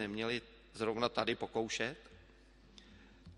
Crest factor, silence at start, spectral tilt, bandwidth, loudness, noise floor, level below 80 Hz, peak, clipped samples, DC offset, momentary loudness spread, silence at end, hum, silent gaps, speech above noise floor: 26 dB; 0 s; -4 dB/octave; 11.5 kHz; -38 LUFS; -62 dBFS; -64 dBFS; -14 dBFS; under 0.1%; under 0.1%; 24 LU; 0 s; none; none; 24 dB